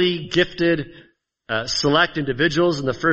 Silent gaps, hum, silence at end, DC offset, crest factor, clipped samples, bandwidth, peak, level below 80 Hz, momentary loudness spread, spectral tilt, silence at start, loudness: none; none; 0 s; under 0.1%; 18 dB; under 0.1%; 8.2 kHz; -2 dBFS; -48 dBFS; 8 LU; -4.5 dB/octave; 0 s; -20 LUFS